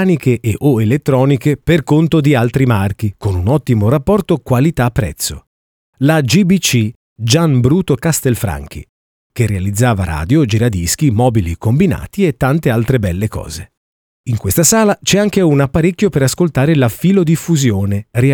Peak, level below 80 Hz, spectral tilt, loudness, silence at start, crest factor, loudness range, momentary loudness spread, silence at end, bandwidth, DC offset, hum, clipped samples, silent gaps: 0 dBFS; -34 dBFS; -5.5 dB/octave; -13 LUFS; 0 s; 14 dB; 3 LU; 8 LU; 0 s; over 20 kHz; under 0.1%; none; under 0.1%; 5.47-5.93 s, 6.96-7.16 s, 8.89-9.30 s, 13.77-14.24 s